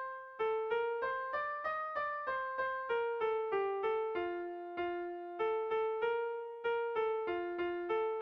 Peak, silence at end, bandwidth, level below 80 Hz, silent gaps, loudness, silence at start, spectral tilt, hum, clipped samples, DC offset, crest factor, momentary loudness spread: -24 dBFS; 0 s; 5.4 kHz; -74 dBFS; none; -37 LUFS; 0 s; -1.5 dB/octave; none; under 0.1%; under 0.1%; 12 dB; 5 LU